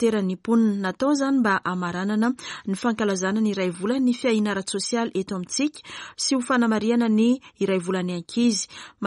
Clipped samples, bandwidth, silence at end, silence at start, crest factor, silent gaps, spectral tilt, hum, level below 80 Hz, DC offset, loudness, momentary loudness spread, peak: under 0.1%; 11.5 kHz; 0 s; 0 s; 14 dB; none; -4.5 dB/octave; none; -66 dBFS; under 0.1%; -23 LUFS; 7 LU; -10 dBFS